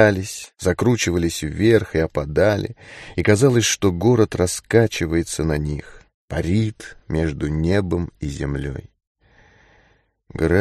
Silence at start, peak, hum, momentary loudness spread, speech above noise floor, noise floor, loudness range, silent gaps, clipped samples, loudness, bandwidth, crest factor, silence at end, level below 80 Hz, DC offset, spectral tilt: 0 s; -2 dBFS; none; 13 LU; 40 dB; -60 dBFS; 7 LU; 6.14-6.28 s, 9.07-9.15 s; under 0.1%; -20 LUFS; 13 kHz; 18 dB; 0 s; -36 dBFS; under 0.1%; -5.5 dB/octave